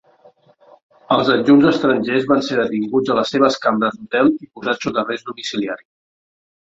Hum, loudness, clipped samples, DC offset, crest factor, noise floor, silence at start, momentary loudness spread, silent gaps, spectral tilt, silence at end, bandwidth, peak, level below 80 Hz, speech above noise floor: none; -17 LUFS; under 0.1%; under 0.1%; 16 dB; -51 dBFS; 1.1 s; 12 LU; none; -5.5 dB/octave; 0.9 s; 7.8 kHz; -2 dBFS; -58 dBFS; 34 dB